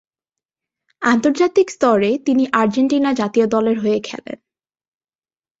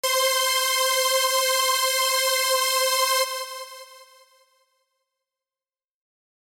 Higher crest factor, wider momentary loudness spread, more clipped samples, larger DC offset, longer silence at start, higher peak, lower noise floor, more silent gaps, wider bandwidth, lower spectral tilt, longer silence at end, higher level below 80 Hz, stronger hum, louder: about the same, 16 dB vs 16 dB; about the same, 10 LU vs 9 LU; neither; neither; first, 1 s vs 0.05 s; first, -2 dBFS vs -8 dBFS; about the same, under -90 dBFS vs under -90 dBFS; neither; second, 8 kHz vs 17 kHz; first, -5.5 dB/octave vs 6 dB/octave; second, 1.25 s vs 2.45 s; first, -62 dBFS vs -84 dBFS; neither; first, -17 LUFS vs -20 LUFS